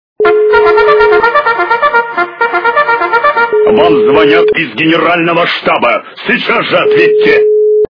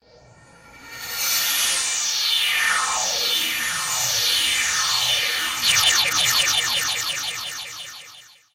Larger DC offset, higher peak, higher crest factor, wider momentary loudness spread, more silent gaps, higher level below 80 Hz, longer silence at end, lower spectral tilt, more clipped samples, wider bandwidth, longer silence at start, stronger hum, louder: neither; first, 0 dBFS vs -6 dBFS; second, 8 dB vs 18 dB; second, 5 LU vs 13 LU; neither; first, -44 dBFS vs -56 dBFS; second, 0.1 s vs 0.3 s; first, -6.5 dB/octave vs 2 dB/octave; first, 0.8% vs under 0.1%; second, 5.4 kHz vs 16 kHz; second, 0.2 s vs 0.65 s; neither; first, -8 LUFS vs -19 LUFS